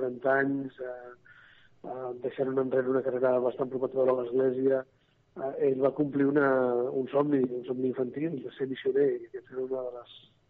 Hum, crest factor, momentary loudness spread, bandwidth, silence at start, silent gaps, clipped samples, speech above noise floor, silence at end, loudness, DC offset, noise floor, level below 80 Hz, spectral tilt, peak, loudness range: none; 16 dB; 14 LU; 4.2 kHz; 0 s; none; under 0.1%; 29 dB; 0.3 s; -29 LUFS; under 0.1%; -58 dBFS; -74 dBFS; -6 dB/octave; -12 dBFS; 3 LU